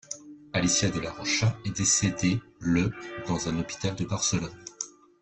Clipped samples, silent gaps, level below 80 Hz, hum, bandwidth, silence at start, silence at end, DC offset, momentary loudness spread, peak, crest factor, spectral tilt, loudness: under 0.1%; none; -52 dBFS; none; 8.8 kHz; 0.1 s; 0.35 s; under 0.1%; 14 LU; -10 dBFS; 18 dB; -3.5 dB/octave; -27 LUFS